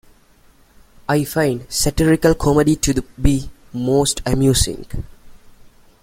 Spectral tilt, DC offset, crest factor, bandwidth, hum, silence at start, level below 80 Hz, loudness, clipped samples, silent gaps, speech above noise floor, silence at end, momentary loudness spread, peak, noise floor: -5 dB/octave; under 0.1%; 18 dB; 16.5 kHz; none; 1.1 s; -30 dBFS; -17 LUFS; under 0.1%; none; 34 dB; 0.65 s; 16 LU; 0 dBFS; -51 dBFS